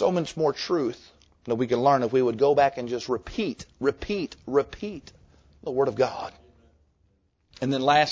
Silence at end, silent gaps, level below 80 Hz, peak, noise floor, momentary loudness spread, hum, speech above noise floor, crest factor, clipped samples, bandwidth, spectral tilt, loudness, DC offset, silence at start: 0 s; none; -54 dBFS; -6 dBFS; -67 dBFS; 15 LU; none; 43 dB; 20 dB; under 0.1%; 8 kHz; -5.5 dB/octave; -25 LUFS; under 0.1%; 0 s